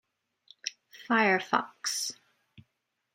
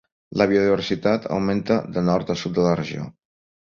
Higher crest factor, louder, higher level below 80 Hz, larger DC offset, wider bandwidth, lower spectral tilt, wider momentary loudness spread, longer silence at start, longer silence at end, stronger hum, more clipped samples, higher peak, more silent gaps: about the same, 24 dB vs 20 dB; second, -29 LUFS vs -22 LUFS; second, -84 dBFS vs -52 dBFS; neither; first, 16.5 kHz vs 7.4 kHz; second, -2.5 dB/octave vs -7 dB/octave; first, 15 LU vs 11 LU; first, 0.65 s vs 0.3 s; first, 1 s vs 0.6 s; neither; neither; second, -8 dBFS vs -2 dBFS; neither